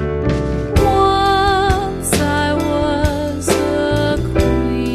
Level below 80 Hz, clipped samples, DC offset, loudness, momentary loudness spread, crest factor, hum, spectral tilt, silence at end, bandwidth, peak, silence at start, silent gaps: -26 dBFS; under 0.1%; under 0.1%; -16 LUFS; 5 LU; 14 dB; none; -5.5 dB/octave; 0 s; 14 kHz; 0 dBFS; 0 s; none